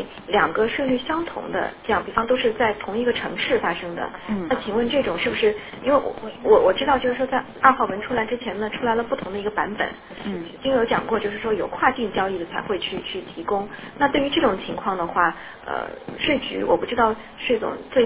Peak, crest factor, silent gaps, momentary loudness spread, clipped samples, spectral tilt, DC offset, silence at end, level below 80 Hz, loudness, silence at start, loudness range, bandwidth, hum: 0 dBFS; 22 dB; none; 9 LU; under 0.1%; -8.5 dB/octave; under 0.1%; 0 s; -50 dBFS; -23 LUFS; 0 s; 4 LU; 4 kHz; none